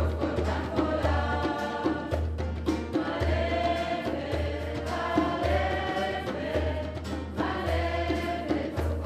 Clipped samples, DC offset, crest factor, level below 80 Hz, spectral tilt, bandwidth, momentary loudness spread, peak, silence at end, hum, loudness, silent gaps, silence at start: under 0.1%; under 0.1%; 18 dB; -36 dBFS; -7 dB/octave; 13.5 kHz; 5 LU; -12 dBFS; 0 s; none; -29 LUFS; none; 0 s